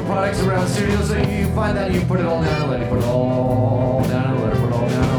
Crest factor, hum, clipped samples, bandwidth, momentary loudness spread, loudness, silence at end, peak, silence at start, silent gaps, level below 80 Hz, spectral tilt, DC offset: 14 dB; none; under 0.1%; 18.5 kHz; 2 LU; -19 LUFS; 0 s; -4 dBFS; 0 s; none; -32 dBFS; -7 dB/octave; under 0.1%